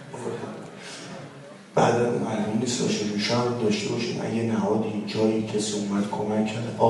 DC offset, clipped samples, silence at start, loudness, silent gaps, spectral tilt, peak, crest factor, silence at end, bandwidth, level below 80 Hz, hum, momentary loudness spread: under 0.1%; under 0.1%; 0 s; -25 LUFS; none; -5 dB/octave; -6 dBFS; 18 dB; 0 s; 11.5 kHz; -64 dBFS; none; 15 LU